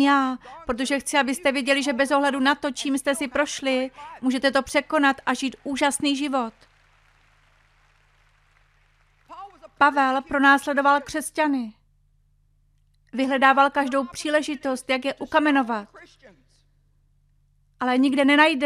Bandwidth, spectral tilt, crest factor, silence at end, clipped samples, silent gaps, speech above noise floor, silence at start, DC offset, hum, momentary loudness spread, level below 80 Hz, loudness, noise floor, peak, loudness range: 15 kHz; -2.5 dB/octave; 20 dB; 0 s; under 0.1%; none; 40 dB; 0 s; under 0.1%; none; 11 LU; -58 dBFS; -22 LUFS; -62 dBFS; -4 dBFS; 6 LU